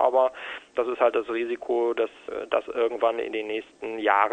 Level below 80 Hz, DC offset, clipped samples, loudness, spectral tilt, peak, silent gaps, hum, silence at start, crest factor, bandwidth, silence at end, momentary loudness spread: -66 dBFS; under 0.1%; under 0.1%; -26 LUFS; -4.5 dB/octave; -4 dBFS; none; none; 0 s; 20 dB; 9.2 kHz; 0 s; 9 LU